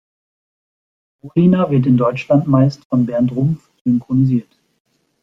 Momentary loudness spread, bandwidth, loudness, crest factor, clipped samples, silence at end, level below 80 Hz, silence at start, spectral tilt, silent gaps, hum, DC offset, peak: 7 LU; 6.8 kHz; -16 LUFS; 16 dB; under 0.1%; 0.8 s; -54 dBFS; 1.25 s; -10 dB/octave; 2.85-2.90 s, 3.81-3.85 s; none; under 0.1%; -2 dBFS